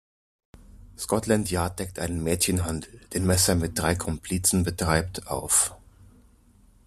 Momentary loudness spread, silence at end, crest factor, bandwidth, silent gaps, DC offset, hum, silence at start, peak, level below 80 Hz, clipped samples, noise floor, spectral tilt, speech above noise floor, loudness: 10 LU; 1.1 s; 22 dB; 14.5 kHz; none; under 0.1%; none; 0.6 s; -6 dBFS; -46 dBFS; under 0.1%; -57 dBFS; -4 dB/octave; 32 dB; -25 LUFS